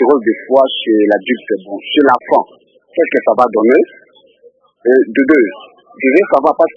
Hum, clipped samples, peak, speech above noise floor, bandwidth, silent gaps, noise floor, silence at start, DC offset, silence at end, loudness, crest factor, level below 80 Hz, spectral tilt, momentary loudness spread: none; 0.2%; 0 dBFS; 36 dB; 6 kHz; none; -47 dBFS; 0 s; under 0.1%; 0.05 s; -12 LUFS; 12 dB; -60 dBFS; -6.5 dB/octave; 8 LU